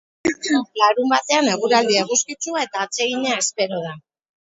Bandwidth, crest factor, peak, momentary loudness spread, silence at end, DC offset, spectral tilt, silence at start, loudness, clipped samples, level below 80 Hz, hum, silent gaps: 8.2 kHz; 20 dB; 0 dBFS; 8 LU; 0.55 s; under 0.1%; -2 dB/octave; 0.25 s; -19 LUFS; under 0.1%; -64 dBFS; none; none